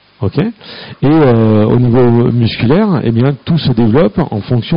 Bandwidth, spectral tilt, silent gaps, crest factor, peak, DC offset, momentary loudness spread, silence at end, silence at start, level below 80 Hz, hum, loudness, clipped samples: 5.4 kHz; -7.5 dB/octave; none; 10 dB; 0 dBFS; under 0.1%; 8 LU; 0 s; 0.2 s; -36 dBFS; none; -11 LUFS; under 0.1%